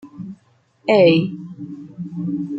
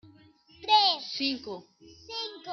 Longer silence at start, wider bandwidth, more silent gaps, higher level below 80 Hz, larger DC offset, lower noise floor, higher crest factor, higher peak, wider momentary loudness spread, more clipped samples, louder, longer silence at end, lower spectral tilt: about the same, 0.05 s vs 0.05 s; first, 7.8 kHz vs 6.6 kHz; neither; first, -64 dBFS vs -72 dBFS; neither; about the same, -58 dBFS vs -58 dBFS; about the same, 18 dB vs 20 dB; first, -2 dBFS vs -10 dBFS; first, 22 LU vs 19 LU; neither; first, -17 LUFS vs -26 LUFS; about the same, 0 s vs 0 s; first, -8 dB/octave vs -2.5 dB/octave